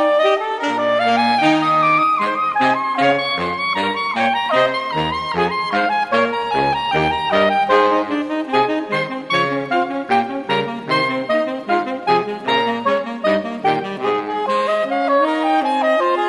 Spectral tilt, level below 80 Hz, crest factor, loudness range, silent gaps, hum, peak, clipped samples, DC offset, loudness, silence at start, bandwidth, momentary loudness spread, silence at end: -5 dB/octave; -52 dBFS; 16 dB; 3 LU; none; none; -2 dBFS; under 0.1%; under 0.1%; -17 LUFS; 0 s; 11.5 kHz; 6 LU; 0 s